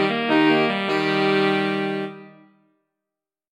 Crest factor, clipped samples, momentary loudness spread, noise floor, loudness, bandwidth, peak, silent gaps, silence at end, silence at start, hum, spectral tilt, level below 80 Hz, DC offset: 18 dB; under 0.1%; 9 LU; -87 dBFS; -20 LUFS; 11 kHz; -4 dBFS; none; 1.2 s; 0 s; none; -6 dB/octave; -74 dBFS; under 0.1%